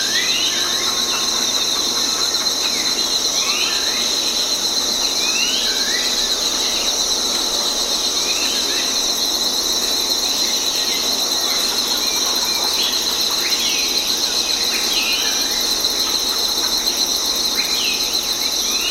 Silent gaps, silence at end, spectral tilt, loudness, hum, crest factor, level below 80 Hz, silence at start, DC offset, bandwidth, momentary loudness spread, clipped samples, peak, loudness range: none; 0 s; 1 dB/octave; -16 LUFS; none; 16 dB; -46 dBFS; 0 s; under 0.1%; 17 kHz; 1 LU; under 0.1%; -4 dBFS; 0 LU